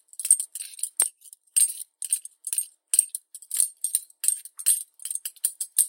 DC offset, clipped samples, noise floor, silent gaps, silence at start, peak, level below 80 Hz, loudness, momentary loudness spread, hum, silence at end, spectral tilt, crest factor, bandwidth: under 0.1%; under 0.1%; -44 dBFS; none; 0.2 s; 0 dBFS; under -90 dBFS; -24 LUFS; 11 LU; none; 0 s; 6.5 dB/octave; 26 dB; 17 kHz